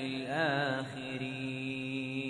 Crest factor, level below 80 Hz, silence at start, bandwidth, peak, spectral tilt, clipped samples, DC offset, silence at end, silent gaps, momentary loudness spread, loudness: 18 dB; -70 dBFS; 0 s; 10.5 kHz; -18 dBFS; -6 dB/octave; under 0.1%; under 0.1%; 0 s; none; 7 LU; -35 LUFS